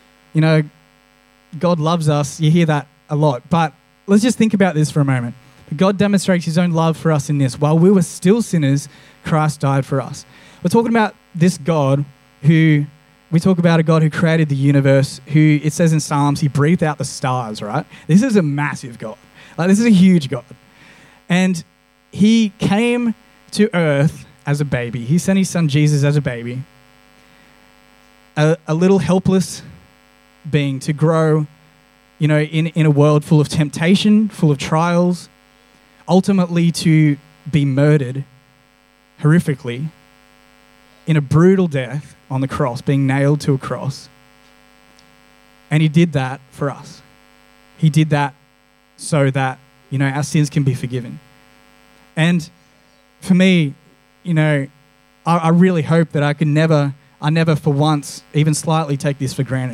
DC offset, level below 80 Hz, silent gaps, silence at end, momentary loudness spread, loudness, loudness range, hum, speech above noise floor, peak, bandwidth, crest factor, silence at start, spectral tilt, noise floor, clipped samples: under 0.1%; -54 dBFS; none; 0 s; 13 LU; -16 LUFS; 5 LU; none; 39 dB; 0 dBFS; 13 kHz; 16 dB; 0.35 s; -6.5 dB/octave; -54 dBFS; under 0.1%